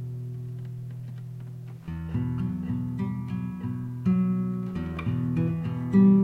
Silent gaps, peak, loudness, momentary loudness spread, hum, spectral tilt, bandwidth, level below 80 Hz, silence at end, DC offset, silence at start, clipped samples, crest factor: none; -10 dBFS; -29 LUFS; 14 LU; none; -10.5 dB/octave; 4.2 kHz; -50 dBFS; 0 s; under 0.1%; 0 s; under 0.1%; 18 dB